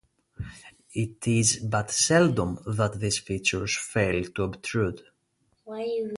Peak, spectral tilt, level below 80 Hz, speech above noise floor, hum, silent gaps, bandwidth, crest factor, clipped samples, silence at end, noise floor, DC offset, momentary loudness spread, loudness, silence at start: -8 dBFS; -4 dB/octave; -50 dBFS; 45 dB; none; none; 11.5 kHz; 18 dB; under 0.1%; 0 s; -71 dBFS; under 0.1%; 19 LU; -26 LUFS; 0.4 s